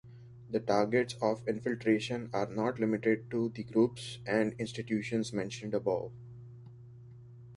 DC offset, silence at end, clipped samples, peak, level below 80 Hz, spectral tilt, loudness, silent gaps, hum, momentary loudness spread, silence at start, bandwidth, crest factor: under 0.1%; 0 s; under 0.1%; -14 dBFS; -66 dBFS; -6 dB/octave; -33 LUFS; none; none; 22 LU; 0.05 s; 11.5 kHz; 20 dB